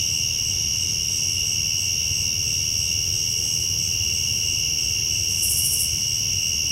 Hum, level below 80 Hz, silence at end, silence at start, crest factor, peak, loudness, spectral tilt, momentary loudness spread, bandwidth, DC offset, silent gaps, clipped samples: none; -42 dBFS; 0 s; 0 s; 14 dB; -8 dBFS; -20 LUFS; 0 dB/octave; 2 LU; 16 kHz; under 0.1%; none; under 0.1%